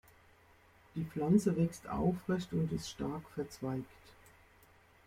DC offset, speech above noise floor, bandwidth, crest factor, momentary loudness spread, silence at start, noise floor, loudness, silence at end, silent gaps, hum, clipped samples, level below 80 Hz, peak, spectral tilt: under 0.1%; 29 dB; 15.5 kHz; 20 dB; 13 LU; 0.95 s; -64 dBFS; -36 LUFS; 0.95 s; none; none; under 0.1%; -60 dBFS; -16 dBFS; -7 dB/octave